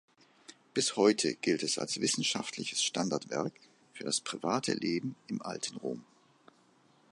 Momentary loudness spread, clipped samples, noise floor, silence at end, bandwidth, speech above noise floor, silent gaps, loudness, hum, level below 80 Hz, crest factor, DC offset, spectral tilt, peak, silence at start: 13 LU; under 0.1%; -66 dBFS; 1.1 s; 11.5 kHz; 33 dB; none; -32 LUFS; none; -78 dBFS; 22 dB; under 0.1%; -3 dB/octave; -12 dBFS; 0.5 s